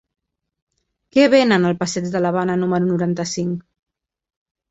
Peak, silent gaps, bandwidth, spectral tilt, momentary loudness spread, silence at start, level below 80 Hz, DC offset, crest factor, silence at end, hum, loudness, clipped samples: -2 dBFS; none; 8 kHz; -5.5 dB/octave; 10 LU; 1.15 s; -58 dBFS; under 0.1%; 18 dB; 1.1 s; none; -18 LUFS; under 0.1%